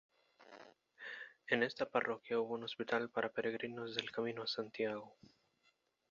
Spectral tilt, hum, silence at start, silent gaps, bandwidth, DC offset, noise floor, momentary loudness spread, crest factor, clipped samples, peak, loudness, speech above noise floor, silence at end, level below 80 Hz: -2 dB/octave; none; 0.4 s; none; 7.4 kHz; under 0.1%; -78 dBFS; 18 LU; 24 dB; under 0.1%; -18 dBFS; -40 LUFS; 38 dB; 1 s; -84 dBFS